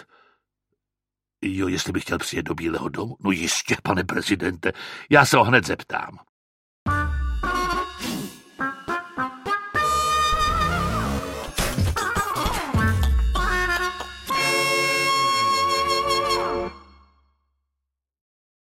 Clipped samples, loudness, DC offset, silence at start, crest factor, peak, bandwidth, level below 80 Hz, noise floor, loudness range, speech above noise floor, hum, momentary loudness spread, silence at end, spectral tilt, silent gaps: under 0.1%; -23 LUFS; under 0.1%; 1.4 s; 24 dB; 0 dBFS; 16.5 kHz; -34 dBFS; -88 dBFS; 6 LU; 65 dB; none; 10 LU; 1.8 s; -4 dB/octave; 6.29-6.86 s